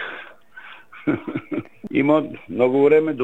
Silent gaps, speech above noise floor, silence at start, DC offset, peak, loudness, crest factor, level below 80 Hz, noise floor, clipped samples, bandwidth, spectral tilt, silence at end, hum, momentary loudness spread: none; 24 dB; 0 s; 0.4%; -4 dBFS; -20 LUFS; 18 dB; -64 dBFS; -43 dBFS; under 0.1%; 4.1 kHz; -8.5 dB/octave; 0 s; none; 25 LU